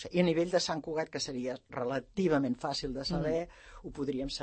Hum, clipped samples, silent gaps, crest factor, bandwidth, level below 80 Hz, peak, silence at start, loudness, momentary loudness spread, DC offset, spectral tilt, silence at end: none; under 0.1%; none; 18 dB; 8.8 kHz; -54 dBFS; -16 dBFS; 0 s; -33 LUFS; 9 LU; under 0.1%; -5 dB/octave; 0 s